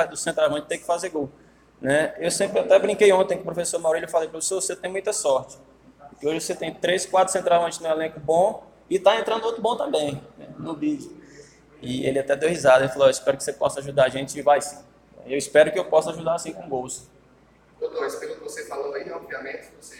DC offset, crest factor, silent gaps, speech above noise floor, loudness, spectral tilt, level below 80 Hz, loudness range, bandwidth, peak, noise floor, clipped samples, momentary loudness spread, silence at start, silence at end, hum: under 0.1%; 20 dB; none; 33 dB; -23 LUFS; -3.5 dB/octave; -60 dBFS; 6 LU; 16.5 kHz; -4 dBFS; -55 dBFS; under 0.1%; 15 LU; 0 s; 0 s; none